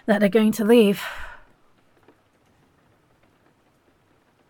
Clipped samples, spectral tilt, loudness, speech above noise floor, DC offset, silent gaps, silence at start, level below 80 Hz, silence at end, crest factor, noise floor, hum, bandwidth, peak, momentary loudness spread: under 0.1%; -6 dB/octave; -19 LUFS; 44 dB; under 0.1%; none; 0.05 s; -54 dBFS; 3.15 s; 18 dB; -62 dBFS; none; 17.5 kHz; -6 dBFS; 21 LU